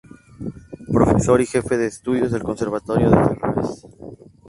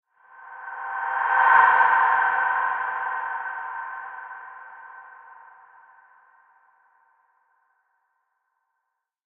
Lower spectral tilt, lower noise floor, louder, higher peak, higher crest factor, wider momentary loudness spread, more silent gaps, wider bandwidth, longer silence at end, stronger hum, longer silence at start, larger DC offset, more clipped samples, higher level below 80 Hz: first, -7.5 dB/octave vs 3 dB/octave; second, -40 dBFS vs -80 dBFS; about the same, -19 LUFS vs -21 LUFS; first, 0 dBFS vs -4 dBFS; about the same, 20 dB vs 22 dB; second, 21 LU vs 26 LU; neither; first, 11.5 kHz vs 4.1 kHz; second, 0.35 s vs 4.05 s; neither; about the same, 0.4 s vs 0.4 s; neither; neither; first, -38 dBFS vs -80 dBFS